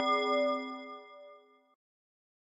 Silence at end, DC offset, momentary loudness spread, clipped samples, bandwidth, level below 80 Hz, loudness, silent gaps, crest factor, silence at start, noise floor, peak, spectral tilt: 1.15 s; under 0.1%; 23 LU; under 0.1%; 10.5 kHz; under -90 dBFS; -32 LUFS; none; 18 dB; 0 s; -58 dBFS; -18 dBFS; -2 dB/octave